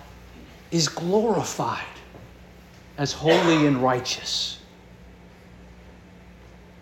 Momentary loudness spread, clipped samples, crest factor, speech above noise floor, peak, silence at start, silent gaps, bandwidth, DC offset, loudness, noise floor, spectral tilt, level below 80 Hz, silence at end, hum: 24 LU; under 0.1%; 20 dB; 25 dB; -6 dBFS; 0 s; none; 17 kHz; under 0.1%; -23 LUFS; -47 dBFS; -4.5 dB/octave; -52 dBFS; 0.35 s; none